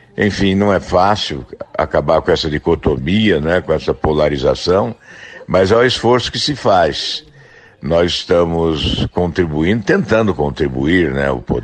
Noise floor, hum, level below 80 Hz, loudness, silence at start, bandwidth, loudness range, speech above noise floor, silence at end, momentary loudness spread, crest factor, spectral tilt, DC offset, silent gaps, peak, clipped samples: -43 dBFS; none; -34 dBFS; -15 LUFS; 0.15 s; 9.4 kHz; 1 LU; 28 dB; 0 s; 7 LU; 14 dB; -6 dB/octave; under 0.1%; none; -2 dBFS; under 0.1%